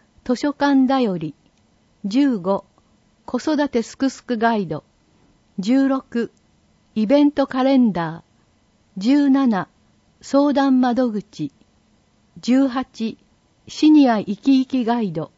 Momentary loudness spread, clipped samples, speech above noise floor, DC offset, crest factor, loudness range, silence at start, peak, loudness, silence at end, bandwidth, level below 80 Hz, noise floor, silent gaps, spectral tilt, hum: 14 LU; under 0.1%; 41 dB; under 0.1%; 16 dB; 4 LU; 0.25 s; -4 dBFS; -19 LUFS; 0.1 s; 8 kHz; -60 dBFS; -59 dBFS; none; -6 dB/octave; none